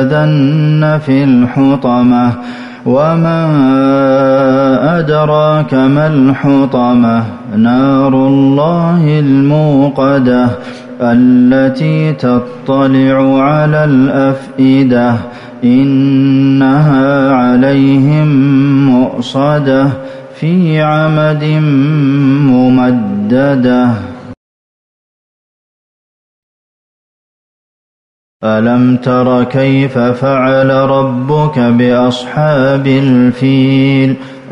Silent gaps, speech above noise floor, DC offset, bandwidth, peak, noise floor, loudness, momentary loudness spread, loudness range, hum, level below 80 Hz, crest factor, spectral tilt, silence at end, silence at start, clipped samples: 24.37-28.40 s; over 82 dB; under 0.1%; 6.8 kHz; 0 dBFS; under -90 dBFS; -9 LUFS; 5 LU; 4 LU; none; -46 dBFS; 8 dB; -9 dB/octave; 0 s; 0 s; under 0.1%